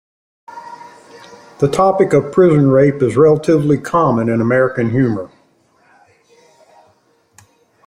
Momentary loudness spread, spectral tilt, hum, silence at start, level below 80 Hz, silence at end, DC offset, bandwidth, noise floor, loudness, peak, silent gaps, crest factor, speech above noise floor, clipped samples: 20 LU; -8 dB/octave; none; 0.55 s; -52 dBFS; 2.6 s; under 0.1%; 11.5 kHz; -56 dBFS; -13 LUFS; -2 dBFS; none; 14 dB; 44 dB; under 0.1%